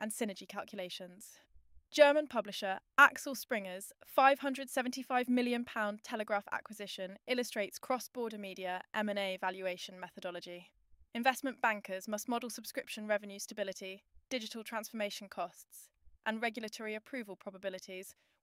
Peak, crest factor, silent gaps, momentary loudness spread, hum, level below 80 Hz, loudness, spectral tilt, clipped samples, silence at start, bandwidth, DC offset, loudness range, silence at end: -10 dBFS; 26 dB; none; 18 LU; none; -78 dBFS; -36 LUFS; -3 dB/octave; under 0.1%; 0 s; 16 kHz; under 0.1%; 10 LU; 0.3 s